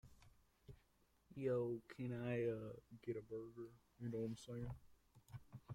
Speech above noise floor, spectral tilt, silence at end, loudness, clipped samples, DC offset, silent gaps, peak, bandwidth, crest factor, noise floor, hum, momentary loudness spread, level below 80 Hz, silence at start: 31 dB; -8 dB/octave; 0 s; -47 LUFS; under 0.1%; under 0.1%; none; -32 dBFS; 16 kHz; 18 dB; -78 dBFS; none; 18 LU; -70 dBFS; 0.05 s